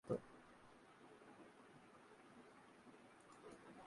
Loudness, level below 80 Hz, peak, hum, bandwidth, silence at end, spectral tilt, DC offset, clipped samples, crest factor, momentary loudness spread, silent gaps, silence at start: -60 LUFS; -84 dBFS; -30 dBFS; none; 11 kHz; 0 s; -6.5 dB/octave; under 0.1%; under 0.1%; 26 dB; 8 LU; none; 0.05 s